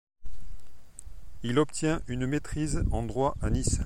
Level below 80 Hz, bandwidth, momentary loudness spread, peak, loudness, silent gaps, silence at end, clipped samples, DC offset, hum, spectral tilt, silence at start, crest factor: -36 dBFS; 15.5 kHz; 21 LU; -12 dBFS; -30 LUFS; none; 0 s; under 0.1%; under 0.1%; none; -5.5 dB/octave; 0.15 s; 16 dB